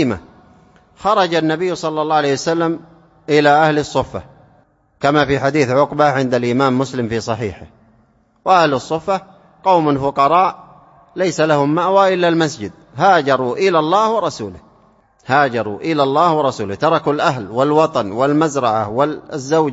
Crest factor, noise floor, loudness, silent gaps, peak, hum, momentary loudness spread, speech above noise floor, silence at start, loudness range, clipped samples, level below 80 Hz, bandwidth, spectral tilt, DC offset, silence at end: 16 dB; -55 dBFS; -16 LUFS; none; 0 dBFS; none; 9 LU; 40 dB; 0 s; 3 LU; under 0.1%; -50 dBFS; 8 kHz; -5.5 dB/octave; under 0.1%; 0 s